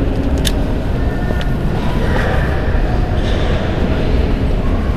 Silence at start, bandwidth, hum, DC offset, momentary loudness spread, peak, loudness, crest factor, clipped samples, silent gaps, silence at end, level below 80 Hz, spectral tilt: 0 s; 14 kHz; none; 5%; 2 LU; 0 dBFS; -17 LUFS; 14 dB; under 0.1%; none; 0 s; -18 dBFS; -6.5 dB/octave